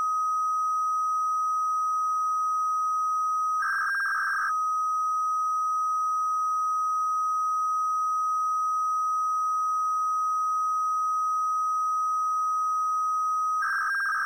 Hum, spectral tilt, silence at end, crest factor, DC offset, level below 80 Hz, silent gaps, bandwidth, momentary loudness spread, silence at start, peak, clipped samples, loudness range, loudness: none; 3.5 dB/octave; 0 s; 6 dB; under 0.1%; -84 dBFS; none; 16 kHz; 0 LU; 0 s; -20 dBFS; under 0.1%; 0 LU; -26 LUFS